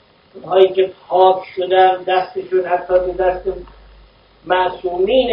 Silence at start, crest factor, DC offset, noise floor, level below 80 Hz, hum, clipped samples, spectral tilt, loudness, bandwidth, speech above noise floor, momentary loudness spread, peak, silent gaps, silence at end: 0.35 s; 16 dB; under 0.1%; -47 dBFS; -44 dBFS; none; under 0.1%; -8 dB/octave; -16 LUFS; 5.4 kHz; 32 dB; 7 LU; 0 dBFS; none; 0 s